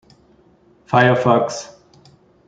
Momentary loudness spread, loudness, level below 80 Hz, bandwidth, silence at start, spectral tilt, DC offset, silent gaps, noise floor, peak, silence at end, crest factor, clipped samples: 17 LU; -16 LUFS; -58 dBFS; 9 kHz; 0.9 s; -6 dB/octave; under 0.1%; none; -53 dBFS; -2 dBFS; 0.8 s; 18 dB; under 0.1%